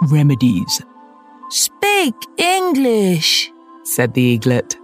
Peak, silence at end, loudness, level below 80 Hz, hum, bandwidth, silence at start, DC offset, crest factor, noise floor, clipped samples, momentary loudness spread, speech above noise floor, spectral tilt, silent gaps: 0 dBFS; 0.1 s; -15 LUFS; -58 dBFS; none; 16 kHz; 0 s; under 0.1%; 16 dB; -43 dBFS; under 0.1%; 8 LU; 28 dB; -4.5 dB/octave; none